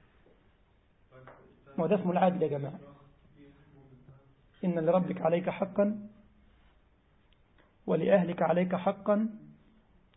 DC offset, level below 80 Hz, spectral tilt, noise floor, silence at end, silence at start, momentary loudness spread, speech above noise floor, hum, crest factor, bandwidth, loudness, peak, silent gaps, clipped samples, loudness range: under 0.1%; -68 dBFS; -11.5 dB/octave; -66 dBFS; 0.7 s; 1.15 s; 15 LU; 37 dB; none; 20 dB; 4 kHz; -30 LUFS; -12 dBFS; none; under 0.1%; 2 LU